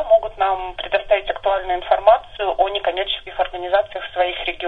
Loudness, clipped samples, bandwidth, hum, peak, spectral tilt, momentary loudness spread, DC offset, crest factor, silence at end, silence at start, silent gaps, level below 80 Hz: -20 LUFS; under 0.1%; 4.5 kHz; none; 0 dBFS; -5 dB/octave; 8 LU; 0.4%; 18 dB; 0 s; 0 s; none; -42 dBFS